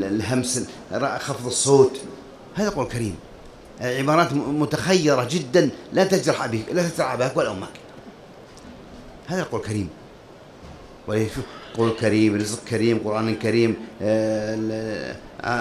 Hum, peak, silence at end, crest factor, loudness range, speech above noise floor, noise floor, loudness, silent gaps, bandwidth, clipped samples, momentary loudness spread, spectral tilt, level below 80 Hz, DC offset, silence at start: none; -4 dBFS; 0 s; 20 dB; 9 LU; 23 dB; -45 dBFS; -22 LUFS; none; 15 kHz; under 0.1%; 20 LU; -5 dB/octave; -50 dBFS; under 0.1%; 0 s